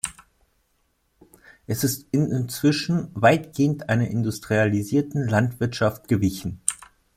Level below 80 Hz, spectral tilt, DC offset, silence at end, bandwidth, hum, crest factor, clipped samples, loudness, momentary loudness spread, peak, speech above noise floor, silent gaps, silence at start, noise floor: -54 dBFS; -5.5 dB/octave; under 0.1%; 0.35 s; 16 kHz; none; 22 dB; under 0.1%; -23 LUFS; 7 LU; 0 dBFS; 46 dB; none; 0.05 s; -69 dBFS